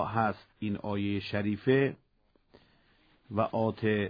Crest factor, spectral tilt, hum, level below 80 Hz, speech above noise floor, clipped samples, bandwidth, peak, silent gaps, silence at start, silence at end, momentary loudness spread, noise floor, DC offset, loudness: 18 dB; -9.5 dB/octave; none; -64 dBFS; 39 dB; under 0.1%; 5.2 kHz; -12 dBFS; none; 0 s; 0 s; 10 LU; -69 dBFS; under 0.1%; -31 LUFS